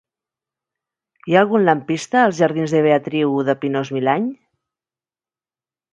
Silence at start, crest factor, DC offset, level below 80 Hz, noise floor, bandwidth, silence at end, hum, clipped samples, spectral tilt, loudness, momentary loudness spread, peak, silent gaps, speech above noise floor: 1.25 s; 20 dB; under 0.1%; -68 dBFS; under -90 dBFS; 10 kHz; 1.6 s; none; under 0.1%; -6 dB/octave; -18 LUFS; 6 LU; 0 dBFS; none; over 73 dB